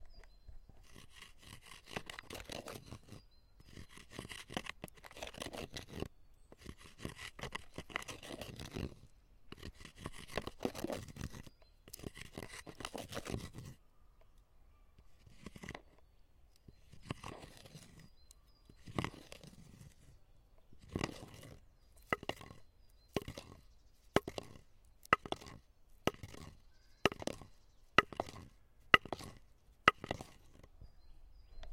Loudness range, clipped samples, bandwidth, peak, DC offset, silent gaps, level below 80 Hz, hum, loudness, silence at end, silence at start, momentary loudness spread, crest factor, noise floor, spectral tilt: 16 LU; under 0.1%; 16.5 kHz; -6 dBFS; under 0.1%; none; -60 dBFS; none; -41 LUFS; 0 s; 0 s; 25 LU; 38 dB; -66 dBFS; -4 dB/octave